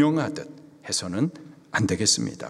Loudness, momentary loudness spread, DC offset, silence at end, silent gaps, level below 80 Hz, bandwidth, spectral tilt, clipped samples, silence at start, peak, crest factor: -25 LUFS; 17 LU; under 0.1%; 0 s; none; -62 dBFS; 13.5 kHz; -3.5 dB/octave; under 0.1%; 0 s; -6 dBFS; 20 dB